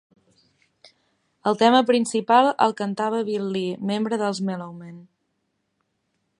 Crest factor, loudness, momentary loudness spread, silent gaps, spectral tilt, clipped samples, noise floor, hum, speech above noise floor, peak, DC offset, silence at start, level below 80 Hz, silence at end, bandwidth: 22 dB; -22 LUFS; 13 LU; none; -5 dB/octave; under 0.1%; -74 dBFS; none; 53 dB; -2 dBFS; under 0.1%; 1.45 s; -74 dBFS; 1.35 s; 11 kHz